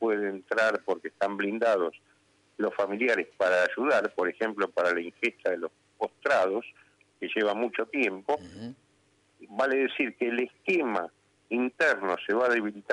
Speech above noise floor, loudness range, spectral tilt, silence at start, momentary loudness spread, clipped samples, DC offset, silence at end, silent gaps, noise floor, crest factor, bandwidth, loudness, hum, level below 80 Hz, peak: 39 dB; 3 LU; -4.5 dB/octave; 0 s; 9 LU; under 0.1%; under 0.1%; 0 s; none; -67 dBFS; 16 dB; 11 kHz; -28 LUFS; none; -78 dBFS; -12 dBFS